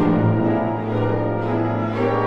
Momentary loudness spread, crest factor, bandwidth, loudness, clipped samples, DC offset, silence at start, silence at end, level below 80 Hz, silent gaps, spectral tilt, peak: 4 LU; 14 dB; 5.4 kHz; -21 LUFS; under 0.1%; under 0.1%; 0 s; 0 s; -44 dBFS; none; -10 dB/octave; -6 dBFS